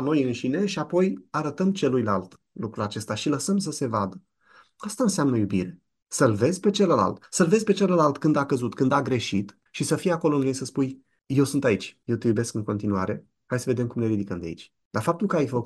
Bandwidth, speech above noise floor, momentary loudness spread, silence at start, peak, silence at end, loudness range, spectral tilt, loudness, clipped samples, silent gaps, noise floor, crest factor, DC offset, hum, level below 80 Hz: 12.5 kHz; 34 dB; 11 LU; 0 s; -6 dBFS; 0 s; 5 LU; -6 dB/octave; -25 LUFS; under 0.1%; 14.85-14.91 s; -58 dBFS; 18 dB; under 0.1%; none; -62 dBFS